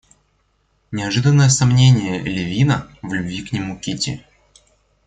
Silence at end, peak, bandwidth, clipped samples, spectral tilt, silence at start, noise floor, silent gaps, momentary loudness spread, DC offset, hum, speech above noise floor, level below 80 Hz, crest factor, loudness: 0.9 s; -2 dBFS; 9.4 kHz; under 0.1%; -5 dB/octave; 0.9 s; -63 dBFS; none; 13 LU; under 0.1%; none; 47 dB; -46 dBFS; 16 dB; -18 LUFS